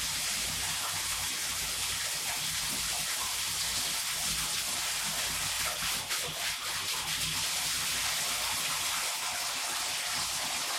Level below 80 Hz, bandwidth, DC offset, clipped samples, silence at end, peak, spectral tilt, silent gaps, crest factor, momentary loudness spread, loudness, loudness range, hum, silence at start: -56 dBFS; 16.5 kHz; under 0.1%; under 0.1%; 0 s; -18 dBFS; 0.5 dB/octave; none; 14 dB; 2 LU; -30 LUFS; 1 LU; none; 0 s